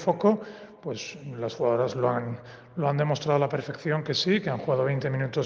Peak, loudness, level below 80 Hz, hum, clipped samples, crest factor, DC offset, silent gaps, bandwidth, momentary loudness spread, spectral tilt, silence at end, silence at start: -8 dBFS; -27 LUFS; -68 dBFS; none; under 0.1%; 18 dB; under 0.1%; none; 7.2 kHz; 12 LU; -6.5 dB/octave; 0 s; 0 s